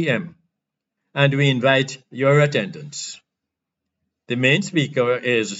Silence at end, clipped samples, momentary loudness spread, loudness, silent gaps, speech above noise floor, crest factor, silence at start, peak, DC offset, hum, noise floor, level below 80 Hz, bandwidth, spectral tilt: 0 s; under 0.1%; 14 LU; -19 LUFS; none; 63 dB; 18 dB; 0 s; -4 dBFS; under 0.1%; none; -83 dBFS; -74 dBFS; 8 kHz; -5.5 dB/octave